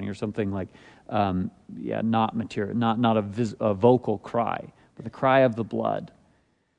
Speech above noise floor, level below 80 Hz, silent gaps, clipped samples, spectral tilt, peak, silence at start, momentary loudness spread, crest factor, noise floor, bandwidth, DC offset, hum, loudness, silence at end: 41 dB; -64 dBFS; none; under 0.1%; -8 dB/octave; -6 dBFS; 0 s; 14 LU; 20 dB; -66 dBFS; 9.4 kHz; under 0.1%; none; -25 LUFS; 0.7 s